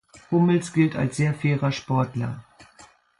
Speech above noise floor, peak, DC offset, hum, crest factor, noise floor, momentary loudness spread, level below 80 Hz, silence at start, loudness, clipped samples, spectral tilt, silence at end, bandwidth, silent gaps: 31 dB; -8 dBFS; under 0.1%; none; 16 dB; -53 dBFS; 9 LU; -58 dBFS; 0.15 s; -23 LUFS; under 0.1%; -7 dB/octave; 0.35 s; 11.5 kHz; none